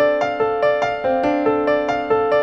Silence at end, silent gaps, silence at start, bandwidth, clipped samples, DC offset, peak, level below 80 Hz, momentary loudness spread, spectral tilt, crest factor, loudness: 0 s; none; 0 s; 7 kHz; under 0.1%; under 0.1%; -6 dBFS; -50 dBFS; 2 LU; -6 dB/octave; 12 dB; -19 LUFS